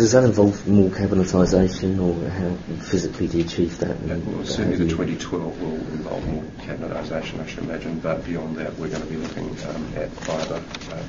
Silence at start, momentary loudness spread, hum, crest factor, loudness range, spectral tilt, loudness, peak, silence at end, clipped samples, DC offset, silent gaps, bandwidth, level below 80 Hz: 0 s; 12 LU; none; 20 dB; 8 LU; -6.5 dB/octave; -24 LUFS; -2 dBFS; 0 s; under 0.1%; under 0.1%; none; 7.6 kHz; -40 dBFS